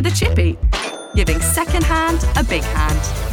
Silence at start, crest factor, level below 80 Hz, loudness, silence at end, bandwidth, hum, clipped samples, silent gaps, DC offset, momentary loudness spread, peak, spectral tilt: 0 s; 16 dB; -20 dBFS; -18 LUFS; 0 s; 17.5 kHz; none; under 0.1%; none; under 0.1%; 4 LU; -2 dBFS; -4.5 dB/octave